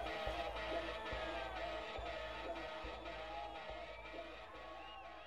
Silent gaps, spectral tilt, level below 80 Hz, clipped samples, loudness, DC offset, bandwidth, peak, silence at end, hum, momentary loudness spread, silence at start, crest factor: none; -4.5 dB/octave; -56 dBFS; under 0.1%; -46 LUFS; under 0.1%; 15 kHz; -28 dBFS; 0 s; none; 9 LU; 0 s; 18 dB